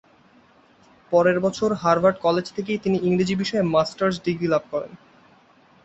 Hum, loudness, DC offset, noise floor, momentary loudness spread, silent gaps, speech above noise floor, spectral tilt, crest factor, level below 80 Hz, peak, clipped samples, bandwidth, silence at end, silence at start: none; -22 LUFS; under 0.1%; -55 dBFS; 7 LU; none; 34 dB; -6.5 dB/octave; 18 dB; -58 dBFS; -4 dBFS; under 0.1%; 8.2 kHz; 0.9 s; 1.1 s